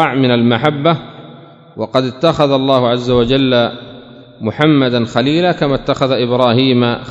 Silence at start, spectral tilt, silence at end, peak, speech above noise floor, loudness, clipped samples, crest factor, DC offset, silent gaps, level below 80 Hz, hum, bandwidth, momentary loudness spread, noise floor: 0 s; -7 dB/octave; 0 s; 0 dBFS; 25 dB; -13 LUFS; under 0.1%; 14 dB; under 0.1%; none; -42 dBFS; none; 7.8 kHz; 9 LU; -37 dBFS